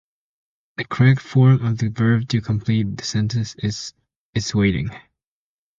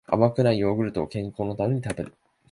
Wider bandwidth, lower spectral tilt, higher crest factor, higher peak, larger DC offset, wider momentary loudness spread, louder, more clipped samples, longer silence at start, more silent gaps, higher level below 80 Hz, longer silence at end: second, 7.6 kHz vs 11.5 kHz; second, -6.5 dB/octave vs -8 dB/octave; about the same, 18 dB vs 20 dB; about the same, -4 dBFS vs -4 dBFS; neither; about the same, 14 LU vs 12 LU; first, -20 LUFS vs -25 LUFS; neither; first, 0.8 s vs 0.1 s; first, 4.16-4.33 s vs none; first, -46 dBFS vs -52 dBFS; first, 0.8 s vs 0.4 s